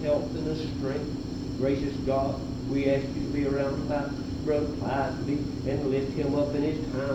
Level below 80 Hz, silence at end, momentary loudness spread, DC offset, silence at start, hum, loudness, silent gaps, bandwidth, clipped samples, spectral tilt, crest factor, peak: -44 dBFS; 0 s; 5 LU; under 0.1%; 0 s; none; -29 LUFS; none; 9 kHz; under 0.1%; -7.5 dB/octave; 16 dB; -12 dBFS